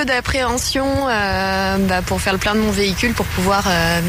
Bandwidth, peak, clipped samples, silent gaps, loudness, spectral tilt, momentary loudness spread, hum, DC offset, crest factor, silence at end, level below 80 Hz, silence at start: 16 kHz; -4 dBFS; under 0.1%; none; -17 LUFS; -4 dB/octave; 3 LU; none; under 0.1%; 14 dB; 0 s; -30 dBFS; 0 s